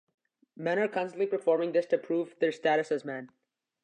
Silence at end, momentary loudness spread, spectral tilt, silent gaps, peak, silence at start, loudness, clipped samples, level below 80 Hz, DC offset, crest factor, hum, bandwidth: 0.6 s; 7 LU; -6 dB/octave; none; -14 dBFS; 0.6 s; -30 LUFS; under 0.1%; -88 dBFS; under 0.1%; 16 dB; none; 9.6 kHz